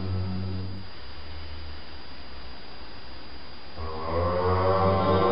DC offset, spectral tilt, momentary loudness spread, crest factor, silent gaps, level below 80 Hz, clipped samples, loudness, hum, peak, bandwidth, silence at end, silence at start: 2%; -5.5 dB/octave; 20 LU; 18 dB; none; -44 dBFS; under 0.1%; -27 LUFS; none; -10 dBFS; 5.8 kHz; 0 s; 0 s